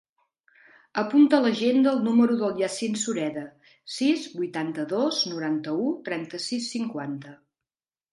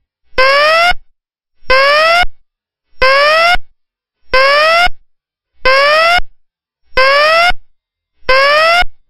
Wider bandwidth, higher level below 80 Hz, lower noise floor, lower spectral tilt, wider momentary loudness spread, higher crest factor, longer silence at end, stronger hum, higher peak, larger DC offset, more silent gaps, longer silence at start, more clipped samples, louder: second, 11.5 kHz vs 16 kHz; second, -76 dBFS vs -28 dBFS; first, under -90 dBFS vs -65 dBFS; first, -4.5 dB/octave vs -1.5 dB/octave; first, 12 LU vs 9 LU; first, 20 dB vs 12 dB; first, 0.8 s vs 0.15 s; neither; second, -6 dBFS vs 0 dBFS; neither; neither; first, 0.95 s vs 0.35 s; second, under 0.1% vs 0.5%; second, -25 LUFS vs -9 LUFS